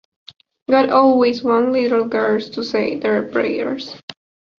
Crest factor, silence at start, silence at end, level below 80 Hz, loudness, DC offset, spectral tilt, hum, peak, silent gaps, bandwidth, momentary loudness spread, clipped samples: 18 dB; 0.7 s; 0.45 s; -60 dBFS; -17 LUFS; under 0.1%; -6 dB/octave; none; 0 dBFS; 4.03-4.08 s; 7 kHz; 16 LU; under 0.1%